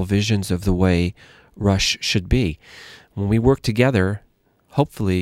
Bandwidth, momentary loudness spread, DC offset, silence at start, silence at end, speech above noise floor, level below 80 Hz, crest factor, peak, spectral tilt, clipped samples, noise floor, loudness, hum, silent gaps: 15 kHz; 13 LU; under 0.1%; 0 s; 0 s; 39 dB; -34 dBFS; 18 dB; -2 dBFS; -5.5 dB/octave; under 0.1%; -58 dBFS; -20 LUFS; none; none